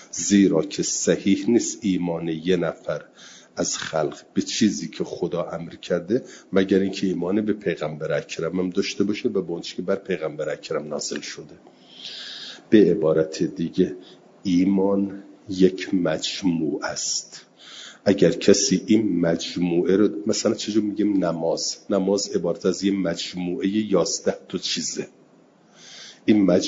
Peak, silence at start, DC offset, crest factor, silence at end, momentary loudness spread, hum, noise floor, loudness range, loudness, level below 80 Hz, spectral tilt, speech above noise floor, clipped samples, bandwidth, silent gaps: -2 dBFS; 0 s; under 0.1%; 20 dB; 0 s; 14 LU; none; -55 dBFS; 5 LU; -23 LUFS; -64 dBFS; -4.5 dB/octave; 32 dB; under 0.1%; 7.8 kHz; none